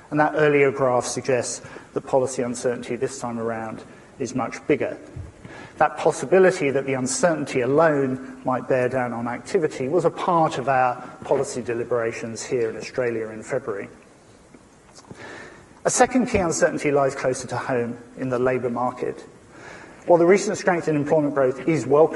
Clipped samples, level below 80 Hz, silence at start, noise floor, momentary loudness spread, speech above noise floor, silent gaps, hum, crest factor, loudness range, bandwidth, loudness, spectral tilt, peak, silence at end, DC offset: under 0.1%; -56 dBFS; 0.1 s; -50 dBFS; 15 LU; 28 dB; none; none; 20 dB; 7 LU; 11.5 kHz; -22 LUFS; -5 dB/octave; -2 dBFS; 0 s; under 0.1%